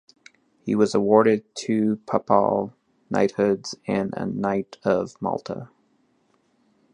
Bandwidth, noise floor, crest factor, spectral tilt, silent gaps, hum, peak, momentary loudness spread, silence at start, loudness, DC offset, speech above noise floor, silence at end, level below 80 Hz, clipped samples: 10 kHz; -65 dBFS; 22 dB; -6.5 dB/octave; none; none; -2 dBFS; 11 LU; 0.65 s; -23 LUFS; under 0.1%; 43 dB; 1.3 s; -62 dBFS; under 0.1%